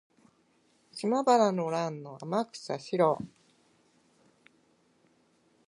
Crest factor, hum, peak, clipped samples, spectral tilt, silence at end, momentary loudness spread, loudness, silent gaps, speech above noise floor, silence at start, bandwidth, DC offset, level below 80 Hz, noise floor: 22 dB; none; -10 dBFS; under 0.1%; -5.5 dB/octave; 2.4 s; 15 LU; -29 LUFS; none; 40 dB; 0.95 s; 11.5 kHz; under 0.1%; -78 dBFS; -68 dBFS